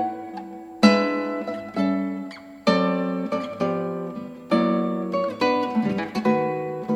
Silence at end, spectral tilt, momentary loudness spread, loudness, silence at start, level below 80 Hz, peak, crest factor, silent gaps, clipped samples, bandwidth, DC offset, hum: 0 s; -6.5 dB/octave; 14 LU; -24 LUFS; 0 s; -64 dBFS; -2 dBFS; 22 dB; none; under 0.1%; 11.5 kHz; under 0.1%; none